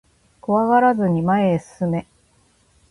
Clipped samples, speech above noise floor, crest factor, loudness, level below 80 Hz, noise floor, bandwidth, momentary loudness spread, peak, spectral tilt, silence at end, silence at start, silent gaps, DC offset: under 0.1%; 41 dB; 16 dB; -19 LUFS; -54 dBFS; -59 dBFS; 11.5 kHz; 9 LU; -4 dBFS; -8.5 dB/octave; 0.9 s; 0.5 s; none; under 0.1%